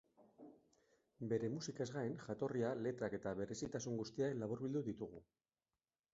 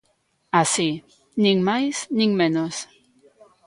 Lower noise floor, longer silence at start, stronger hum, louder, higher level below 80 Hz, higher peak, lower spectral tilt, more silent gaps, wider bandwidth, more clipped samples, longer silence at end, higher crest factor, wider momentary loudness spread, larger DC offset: first, under -90 dBFS vs -67 dBFS; second, 0.2 s vs 0.55 s; neither; second, -44 LUFS vs -21 LUFS; second, -76 dBFS vs -66 dBFS; second, -28 dBFS vs -4 dBFS; first, -6.5 dB/octave vs -4 dB/octave; neither; second, 7.6 kHz vs 11.5 kHz; neither; about the same, 0.9 s vs 0.85 s; about the same, 18 dB vs 20 dB; about the same, 15 LU vs 14 LU; neither